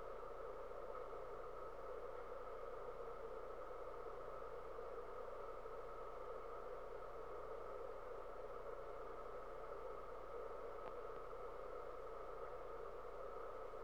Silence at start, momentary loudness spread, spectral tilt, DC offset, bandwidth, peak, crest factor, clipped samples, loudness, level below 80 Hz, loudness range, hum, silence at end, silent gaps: 0 s; 1 LU; -6 dB/octave; 0.2%; 19.5 kHz; -36 dBFS; 18 dB; under 0.1%; -52 LUFS; -64 dBFS; 0 LU; 60 Hz at -75 dBFS; 0 s; none